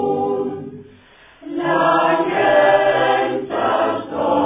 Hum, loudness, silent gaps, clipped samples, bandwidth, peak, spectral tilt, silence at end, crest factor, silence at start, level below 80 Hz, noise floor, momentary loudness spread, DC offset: none; -17 LUFS; none; under 0.1%; 3.9 kHz; -2 dBFS; -9 dB/octave; 0 s; 16 dB; 0 s; -56 dBFS; -47 dBFS; 12 LU; under 0.1%